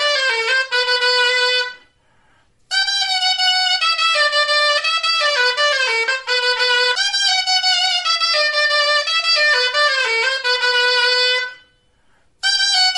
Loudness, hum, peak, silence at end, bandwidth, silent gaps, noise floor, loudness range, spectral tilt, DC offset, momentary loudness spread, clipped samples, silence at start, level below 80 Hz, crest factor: -15 LUFS; none; -6 dBFS; 0 s; 11.5 kHz; none; -59 dBFS; 2 LU; 4 dB/octave; under 0.1%; 3 LU; under 0.1%; 0 s; -66 dBFS; 12 dB